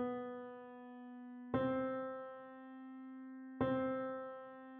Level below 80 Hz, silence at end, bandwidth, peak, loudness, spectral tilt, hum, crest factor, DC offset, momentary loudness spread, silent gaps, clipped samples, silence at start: -72 dBFS; 0 s; 4.2 kHz; -24 dBFS; -43 LUFS; -6 dB/octave; none; 20 dB; under 0.1%; 15 LU; none; under 0.1%; 0 s